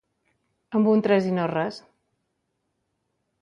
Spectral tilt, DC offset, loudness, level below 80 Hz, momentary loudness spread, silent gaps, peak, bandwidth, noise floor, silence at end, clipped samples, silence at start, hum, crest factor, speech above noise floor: -8 dB/octave; under 0.1%; -23 LUFS; -72 dBFS; 11 LU; none; -8 dBFS; 7.2 kHz; -76 dBFS; 1.6 s; under 0.1%; 0.7 s; none; 18 dB; 55 dB